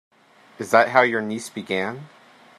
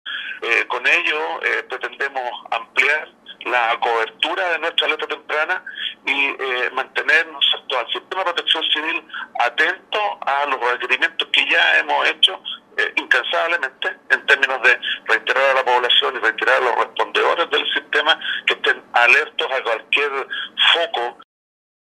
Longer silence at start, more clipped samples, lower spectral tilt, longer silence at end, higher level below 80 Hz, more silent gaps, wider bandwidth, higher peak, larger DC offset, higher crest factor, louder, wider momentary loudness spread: first, 0.6 s vs 0.05 s; neither; first, -4.5 dB/octave vs 0 dB/octave; second, 0.5 s vs 0.7 s; about the same, -72 dBFS vs -76 dBFS; neither; about the same, 14 kHz vs 13.5 kHz; about the same, -2 dBFS vs 0 dBFS; neither; about the same, 22 dB vs 20 dB; second, -21 LUFS vs -18 LUFS; first, 16 LU vs 10 LU